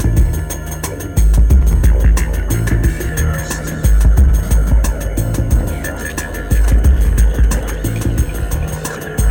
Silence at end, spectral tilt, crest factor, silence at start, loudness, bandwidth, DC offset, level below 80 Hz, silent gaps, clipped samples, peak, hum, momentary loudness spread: 0 s; -6 dB/octave; 12 dB; 0 s; -16 LUFS; 18.5 kHz; under 0.1%; -14 dBFS; none; under 0.1%; -2 dBFS; none; 10 LU